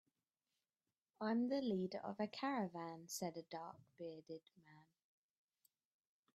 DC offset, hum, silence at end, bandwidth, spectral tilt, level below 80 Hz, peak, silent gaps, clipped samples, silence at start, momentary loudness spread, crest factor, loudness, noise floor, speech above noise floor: under 0.1%; none; 1.55 s; 12.5 kHz; -5 dB/octave; -90 dBFS; -30 dBFS; none; under 0.1%; 1.2 s; 15 LU; 18 dB; -45 LUFS; under -90 dBFS; over 45 dB